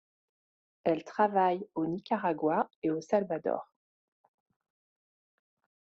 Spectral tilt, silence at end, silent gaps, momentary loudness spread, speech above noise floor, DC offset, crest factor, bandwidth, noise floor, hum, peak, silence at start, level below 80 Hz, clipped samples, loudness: -5.5 dB/octave; 2.25 s; 2.76-2.82 s; 7 LU; over 60 dB; under 0.1%; 20 dB; 7.6 kHz; under -90 dBFS; none; -14 dBFS; 0.85 s; -76 dBFS; under 0.1%; -31 LUFS